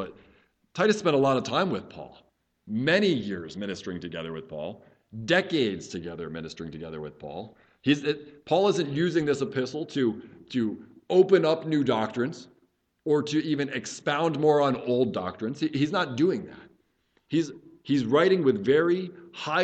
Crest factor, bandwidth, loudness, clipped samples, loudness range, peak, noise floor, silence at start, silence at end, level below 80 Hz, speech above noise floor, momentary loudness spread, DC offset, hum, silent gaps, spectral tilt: 20 dB; 8.8 kHz; -26 LUFS; under 0.1%; 5 LU; -8 dBFS; -70 dBFS; 0 s; 0 s; -64 dBFS; 44 dB; 16 LU; under 0.1%; none; none; -6 dB/octave